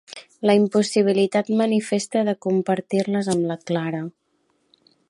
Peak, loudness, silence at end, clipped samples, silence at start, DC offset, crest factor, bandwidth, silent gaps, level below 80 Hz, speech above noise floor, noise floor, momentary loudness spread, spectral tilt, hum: -4 dBFS; -21 LUFS; 1 s; under 0.1%; 0.1 s; under 0.1%; 18 dB; 11.5 kHz; none; -70 dBFS; 47 dB; -68 dBFS; 7 LU; -5.5 dB/octave; none